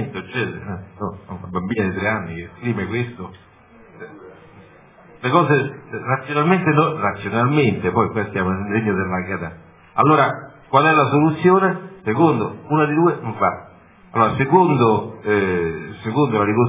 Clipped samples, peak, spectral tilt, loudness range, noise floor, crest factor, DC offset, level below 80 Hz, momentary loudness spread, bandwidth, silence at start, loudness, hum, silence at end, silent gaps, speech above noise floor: under 0.1%; 0 dBFS; -11 dB/octave; 8 LU; -47 dBFS; 20 dB; under 0.1%; -48 dBFS; 15 LU; 3.8 kHz; 0 s; -19 LUFS; none; 0 s; none; 29 dB